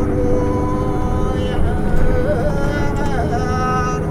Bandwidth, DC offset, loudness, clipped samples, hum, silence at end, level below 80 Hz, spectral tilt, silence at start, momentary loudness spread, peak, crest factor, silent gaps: 11 kHz; under 0.1%; -19 LUFS; under 0.1%; none; 0 s; -20 dBFS; -7.5 dB/octave; 0 s; 2 LU; -2 dBFS; 14 dB; none